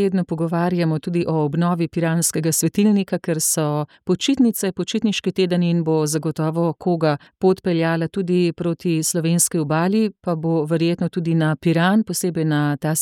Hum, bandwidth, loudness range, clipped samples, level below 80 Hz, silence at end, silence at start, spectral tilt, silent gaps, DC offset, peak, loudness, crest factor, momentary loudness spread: none; 17 kHz; 1 LU; under 0.1%; -60 dBFS; 0 s; 0 s; -5 dB/octave; none; under 0.1%; -6 dBFS; -20 LUFS; 14 dB; 5 LU